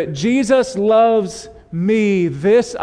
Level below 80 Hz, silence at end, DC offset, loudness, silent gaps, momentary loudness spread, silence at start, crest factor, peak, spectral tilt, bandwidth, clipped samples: -50 dBFS; 0 s; under 0.1%; -15 LUFS; none; 12 LU; 0 s; 12 dB; -2 dBFS; -6 dB/octave; 10.5 kHz; under 0.1%